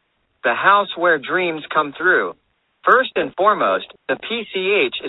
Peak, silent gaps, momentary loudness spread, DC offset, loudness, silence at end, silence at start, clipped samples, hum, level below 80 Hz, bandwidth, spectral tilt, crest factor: 0 dBFS; none; 9 LU; under 0.1%; -18 LUFS; 0 s; 0.45 s; under 0.1%; none; -64 dBFS; 4.1 kHz; -6.5 dB/octave; 18 dB